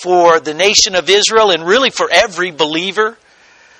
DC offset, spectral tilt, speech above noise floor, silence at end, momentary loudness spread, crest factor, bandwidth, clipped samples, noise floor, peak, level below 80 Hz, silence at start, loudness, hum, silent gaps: under 0.1%; -1.5 dB/octave; 34 dB; 0.65 s; 7 LU; 12 dB; 18.5 kHz; 0.2%; -46 dBFS; 0 dBFS; -50 dBFS; 0 s; -11 LUFS; none; none